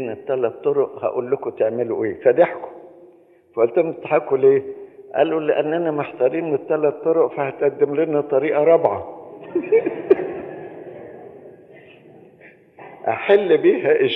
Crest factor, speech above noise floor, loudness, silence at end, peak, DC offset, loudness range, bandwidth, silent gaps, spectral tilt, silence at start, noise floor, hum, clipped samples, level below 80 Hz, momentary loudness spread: 18 dB; 32 dB; -19 LUFS; 0 s; -2 dBFS; under 0.1%; 5 LU; 4 kHz; none; -9 dB/octave; 0 s; -51 dBFS; none; under 0.1%; -70 dBFS; 18 LU